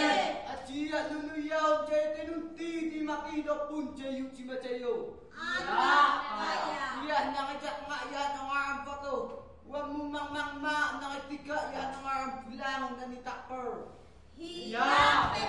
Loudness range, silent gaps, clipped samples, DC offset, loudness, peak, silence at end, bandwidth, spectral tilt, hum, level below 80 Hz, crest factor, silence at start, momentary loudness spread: 6 LU; none; under 0.1%; 0.1%; -33 LUFS; -12 dBFS; 0 s; 11.5 kHz; -3.5 dB/octave; none; -60 dBFS; 22 dB; 0 s; 14 LU